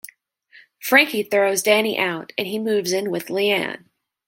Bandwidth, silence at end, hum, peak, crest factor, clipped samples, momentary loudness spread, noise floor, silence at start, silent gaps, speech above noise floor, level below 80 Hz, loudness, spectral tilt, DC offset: 17 kHz; 0.5 s; none; -2 dBFS; 20 dB; under 0.1%; 13 LU; -53 dBFS; 0.8 s; none; 33 dB; -72 dBFS; -20 LUFS; -3 dB/octave; under 0.1%